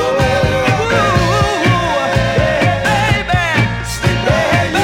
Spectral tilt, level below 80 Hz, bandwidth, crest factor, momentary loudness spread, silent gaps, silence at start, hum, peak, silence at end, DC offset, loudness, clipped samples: -5 dB/octave; -28 dBFS; 16.5 kHz; 14 dB; 2 LU; none; 0 s; none; 0 dBFS; 0 s; under 0.1%; -13 LUFS; under 0.1%